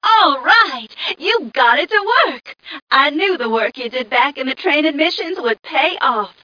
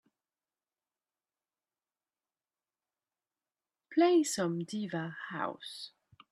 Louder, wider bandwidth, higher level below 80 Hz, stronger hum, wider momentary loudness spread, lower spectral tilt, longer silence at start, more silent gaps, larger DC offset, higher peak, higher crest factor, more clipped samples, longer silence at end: first, -15 LUFS vs -32 LUFS; second, 5.4 kHz vs 12.5 kHz; first, -70 dBFS vs -84 dBFS; neither; second, 9 LU vs 17 LU; second, -3 dB/octave vs -4.5 dB/octave; second, 0 s vs 3.9 s; first, 2.82-2.87 s vs none; neither; first, 0 dBFS vs -16 dBFS; about the same, 16 dB vs 20 dB; neither; second, 0.15 s vs 0.45 s